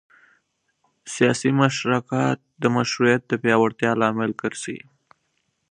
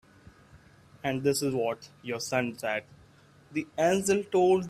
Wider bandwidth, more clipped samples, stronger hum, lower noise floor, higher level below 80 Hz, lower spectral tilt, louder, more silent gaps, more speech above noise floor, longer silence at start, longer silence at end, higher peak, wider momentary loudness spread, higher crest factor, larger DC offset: second, 10.5 kHz vs 15 kHz; neither; neither; first, -72 dBFS vs -58 dBFS; about the same, -66 dBFS vs -64 dBFS; about the same, -5.5 dB/octave vs -4.5 dB/octave; first, -21 LUFS vs -29 LUFS; neither; first, 51 dB vs 30 dB; first, 1.05 s vs 0.55 s; first, 0.9 s vs 0 s; first, -2 dBFS vs -12 dBFS; about the same, 10 LU vs 11 LU; about the same, 22 dB vs 18 dB; neither